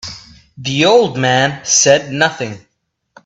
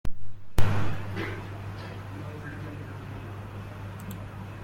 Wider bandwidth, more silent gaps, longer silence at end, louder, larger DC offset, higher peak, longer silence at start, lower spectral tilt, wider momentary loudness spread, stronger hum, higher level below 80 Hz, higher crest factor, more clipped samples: second, 8.4 kHz vs 16.5 kHz; neither; first, 0.65 s vs 0 s; first, -12 LUFS vs -36 LUFS; neither; first, 0 dBFS vs -6 dBFS; about the same, 0.05 s vs 0.05 s; second, -3 dB/octave vs -6.5 dB/octave; first, 16 LU vs 10 LU; neither; second, -52 dBFS vs -40 dBFS; about the same, 16 dB vs 20 dB; neither